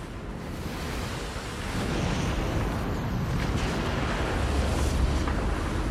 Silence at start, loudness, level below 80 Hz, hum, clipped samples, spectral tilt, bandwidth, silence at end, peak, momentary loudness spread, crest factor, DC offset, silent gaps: 0 s; -29 LUFS; -32 dBFS; none; under 0.1%; -5.5 dB/octave; 15 kHz; 0 s; -14 dBFS; 7 LU; 14 dB; under 0.1%; none